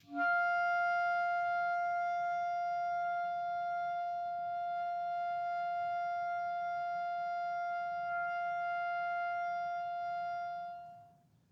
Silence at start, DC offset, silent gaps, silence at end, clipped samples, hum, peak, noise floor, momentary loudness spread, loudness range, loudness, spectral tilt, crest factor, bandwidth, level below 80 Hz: 0.1 s; under 0.1%; none; 0.45 s; under 0.1%; none; -24 dBFS; -64 dBFS; 7 LU; 3 LU; -36 LUFS; -4.5 dB/octave; 12 dB; 6.6 kHz; -84 dBFS